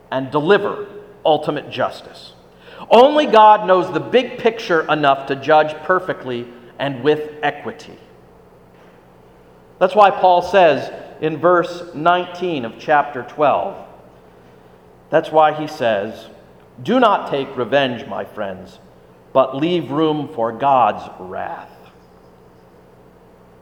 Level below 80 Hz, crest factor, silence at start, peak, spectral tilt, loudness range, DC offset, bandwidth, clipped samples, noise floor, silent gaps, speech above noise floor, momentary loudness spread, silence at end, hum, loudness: -58 dBFS; 18 dB; 0.1 s; 0 dBFS; -6 dB/octave; 7 LU; under 0.1%; 14 kHz; under 0.1%; -46 dBFS; none; 30 dB; 18 LU; 1.95 s; none; -17 LUFS